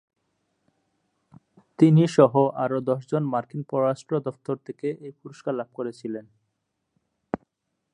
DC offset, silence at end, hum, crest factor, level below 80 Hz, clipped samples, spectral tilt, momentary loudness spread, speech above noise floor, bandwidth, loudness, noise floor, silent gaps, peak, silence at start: under 0.1%; 0.55 s; none; 22 dB; -68 dBFS; under 0.1%; -8.5 dB/octave; 17 LU; 55 dB; 10 kHz; -24 LUFS; -78 dBFS; none; -2 dBFS; 1.8 s